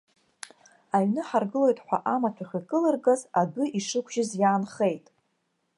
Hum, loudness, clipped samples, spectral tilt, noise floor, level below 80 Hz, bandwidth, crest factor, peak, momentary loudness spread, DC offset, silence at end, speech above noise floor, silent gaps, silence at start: none; -26 LUFS; under 0.1%; -5.5 dB/octave; -75 dBFS; -78 dBFS; 11.5 kHz; 18 dB; -10 dBFS; 13 LU; under 0.1%; 0.8 s; 49 dB; none; 0.95 s